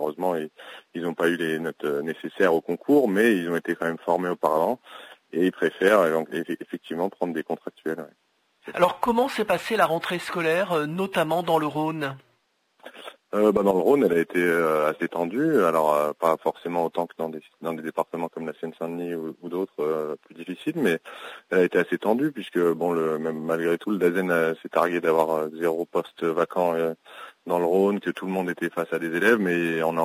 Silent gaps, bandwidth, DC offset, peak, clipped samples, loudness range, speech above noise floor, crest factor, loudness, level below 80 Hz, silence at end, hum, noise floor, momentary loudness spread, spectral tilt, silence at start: none; 16 kHz; under 0.1%; -6 dBFS; under 0.1%; 5 LU; 45 dB; 18 dB; -25 LUFS; -68 dBFS; 0 s; none; -69 dBFS; 13 LU; -6 dB/octave; 0 s